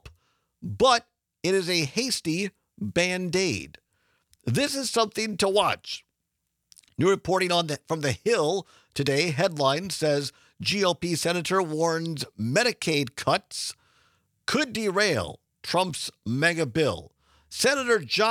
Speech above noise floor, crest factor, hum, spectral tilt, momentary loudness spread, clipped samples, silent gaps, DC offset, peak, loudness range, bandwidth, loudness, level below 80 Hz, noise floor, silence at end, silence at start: 54 dB; 22 dB; none; -4 dB/octave; 11 LU; under 0.1%; none; under 0.1%; -6 dBFS; 2 LU; 17 kHz; -25 LUFS; -62 dBFS; -80 dBFS; 0 s; 0.05 s